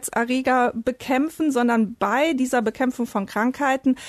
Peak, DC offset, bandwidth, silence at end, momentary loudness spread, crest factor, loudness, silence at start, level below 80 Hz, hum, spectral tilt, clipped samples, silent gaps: -10 dBFS; under 0.1%; 13.5 kHz; 0 s; 4 LU; 12 dB; -22 LUFS; 0 s; -58 dBFS; none; -4.5 dB/octave; under 0.1%; none